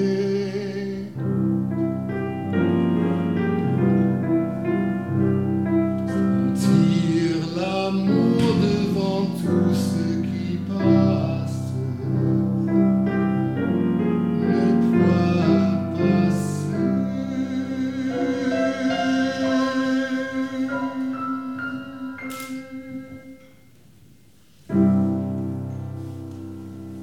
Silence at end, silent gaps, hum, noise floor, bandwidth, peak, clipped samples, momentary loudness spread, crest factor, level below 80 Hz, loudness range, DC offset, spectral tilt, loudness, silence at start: 0 s; none; none; -54 dBFS; 13 kHz; -6 dBFS; under 0.1%; 13 LU; 16 dB; -56 dBFS; 7 LU; 0.2%; -7.5 dB/octave; -22 LUFS; 0 s